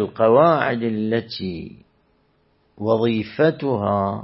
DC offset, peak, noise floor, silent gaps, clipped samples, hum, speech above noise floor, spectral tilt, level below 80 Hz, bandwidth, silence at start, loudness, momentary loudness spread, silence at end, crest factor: under 0.1%; -2 dBFS; -62 dBFS; none; under 0.1%; none; 43 dB; -11.5 dB/octave; -58 dBFS; 5.8 kHz; 0 s; -20 LUFS; 14 LU; 0 s; 18 dB